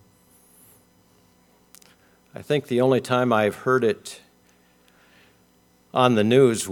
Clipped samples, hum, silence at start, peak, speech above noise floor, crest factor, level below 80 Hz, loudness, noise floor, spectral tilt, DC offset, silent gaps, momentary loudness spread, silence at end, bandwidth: under 0.1%; none; 2.4 s; -2 dBFS; 39 dB; 22 dB; -70 dBFS; -21 LUFS; -60 dBFS; -5.5 dB/octave; under 0.1%; none; 23 LU; 0 s; 18.5 kHz